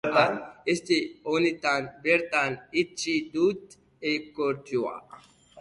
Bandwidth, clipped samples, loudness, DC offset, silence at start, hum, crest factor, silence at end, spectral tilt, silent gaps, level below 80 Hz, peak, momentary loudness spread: 11.5 kHz; under 0.1%; -27 LUFS; under 0.1%; 0.05 s; none; 20 dB; 0 s; -4 dB/octave; none; -66 dBFS; -8 dBFS; 8 LU